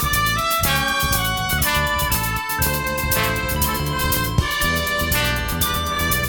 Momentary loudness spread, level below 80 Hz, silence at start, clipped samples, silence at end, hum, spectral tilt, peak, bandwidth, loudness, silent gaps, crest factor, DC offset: 3 LU; -30 dBFS; 0 s; under 0.1%; 0 s; none; -3 dB/octave; -4 dBFS; over 20 kHz; -19 LUFS; none; 16 dB; under 0.1%